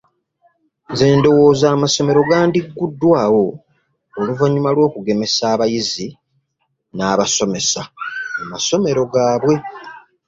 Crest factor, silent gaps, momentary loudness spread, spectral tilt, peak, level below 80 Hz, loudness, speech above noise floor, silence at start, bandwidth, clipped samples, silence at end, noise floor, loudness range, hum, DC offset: 16 dB; none; 13 LU; -4.5 dB/octave; -2 dBFS; -52 dBFS; -16 LUFS; 55 dB; 0.9 s; 7.8 kHz; under 0.1%; 0.3 s; -70 dBFS; 5 LU; none; under 0.1%